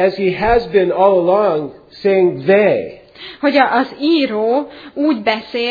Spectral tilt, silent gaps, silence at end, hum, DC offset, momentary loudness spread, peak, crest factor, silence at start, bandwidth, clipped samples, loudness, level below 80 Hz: -7.5 dB/octave; none; 0 s; none; under 0.1%; 9 LU; 0 dBFS; 14 dB; 0 s; 5 kHz; under 0.1%; -15 LUFS; -42 dBFS